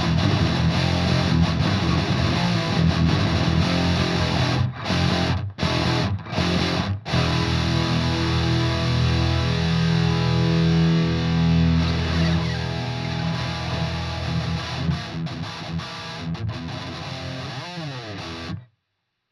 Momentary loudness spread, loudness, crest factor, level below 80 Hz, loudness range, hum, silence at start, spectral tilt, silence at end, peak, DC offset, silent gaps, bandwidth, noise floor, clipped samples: 11 LU; -22 LUFS; 16 dB; -38 dBFS; 9 LU; none; 0 s; -6 dB/octave; 0.7 s; -6 dBFS; under 0.1%; none; 11 kHz; -77 dBFS; under 0.1%